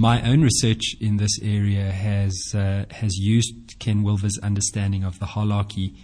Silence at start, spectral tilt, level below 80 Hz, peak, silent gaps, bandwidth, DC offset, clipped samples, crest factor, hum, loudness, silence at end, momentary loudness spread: 0 s; -5 dB/octave; -42 dBFS; -6 dBFS; none; 10.5 kHz; under 0.1%; under 0.1%; 16 dB; none; -22 LUFS; 0 s; 9 LU